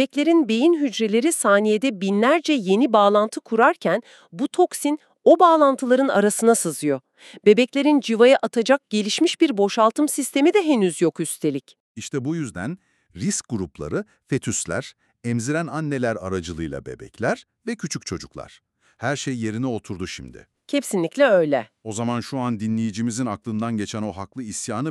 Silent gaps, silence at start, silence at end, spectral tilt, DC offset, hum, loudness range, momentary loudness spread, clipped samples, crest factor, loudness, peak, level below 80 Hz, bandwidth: 11.80-11.95 s; 0 s; 0 s; -4.5 dB/octave; under 0.1%; none; 10 LU; 14 LU; under 0.1%; 18 dB; -21 LUFS; -2 dBFS; -56 dBFS; 13.5 kHz